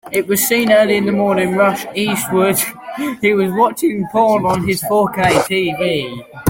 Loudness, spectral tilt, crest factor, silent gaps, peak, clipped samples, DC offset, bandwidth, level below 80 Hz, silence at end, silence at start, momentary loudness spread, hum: -15 LUFS; -4.5 dB/octave; 14 dB; none; 0 dBFS; under 0.1%; under 0.1%; 17 kHz; -48 dBFS; 0 s; 0.05 s; 7 LU; none